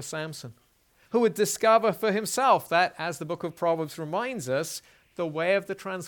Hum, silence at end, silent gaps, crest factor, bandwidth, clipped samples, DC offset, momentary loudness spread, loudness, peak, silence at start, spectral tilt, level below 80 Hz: none; 0 s; none; 18 dB; 19 kHz; under 0.1%; under 0.1%; 13 LU; -26 LUFS; -8 dBFS; 0 s; -4 dB/octave; -72 dBFS